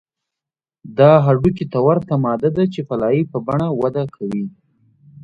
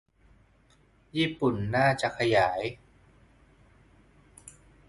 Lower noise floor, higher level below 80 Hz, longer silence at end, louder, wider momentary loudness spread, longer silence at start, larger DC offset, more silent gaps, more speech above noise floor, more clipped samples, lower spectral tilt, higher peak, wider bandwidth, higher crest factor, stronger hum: first, -87 dBFS vs -62 dBFS; first, -48 dBFS vs -58 dBFS; second, 0 s vs 0.4 s; first, -17 LUFS vs -27 LUFS; second, 13 LU vs 24 LU; second, 0.85 s vs 1.15 s; neither; neither; first, 71 dB vs 36 dB; neither; first, -10 dB/octave vs -5.5 dB/octave; first, 0 dBFS vs -10 dBFS; second, 6.4 kHz vs 11.5 kHz; about the same, 18 dB vs 20 dB; neither